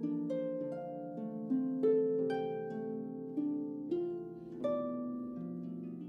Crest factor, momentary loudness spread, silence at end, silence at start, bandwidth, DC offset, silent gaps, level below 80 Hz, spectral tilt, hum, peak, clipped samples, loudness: 16 dB; 11 LU; 0 s; 0 s; 5.6 kHz; under 0.1%; none; -78 dBFS; -9.5 dB/octave; none; -22 dBFS; under 0.1%; -37 LUFS